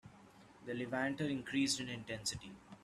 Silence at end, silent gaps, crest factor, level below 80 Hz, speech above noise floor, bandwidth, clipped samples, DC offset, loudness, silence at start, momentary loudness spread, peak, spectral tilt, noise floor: 0 s; none; 18 dB; -70 dBFS; 22 dB; 13.5 kHz; under 0.1%; under 0.1%; -39 LUFS; 0.05 s; 14 LU; -22 dBFS; -3.5 dB/octave; -61 dBFS